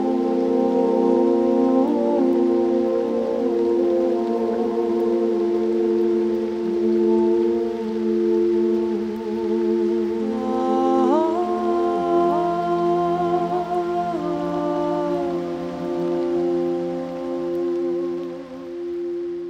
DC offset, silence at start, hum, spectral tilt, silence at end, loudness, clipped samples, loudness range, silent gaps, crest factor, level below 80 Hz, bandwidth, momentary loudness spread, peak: under 0.1%; 0 s; none; -8 dB/octave; 0 s; -21 LUFS; under 0.1%; 5 LU; none; 14 dB; -56 dBFS; 7.4 kHz; 8 LU; -6 dBFS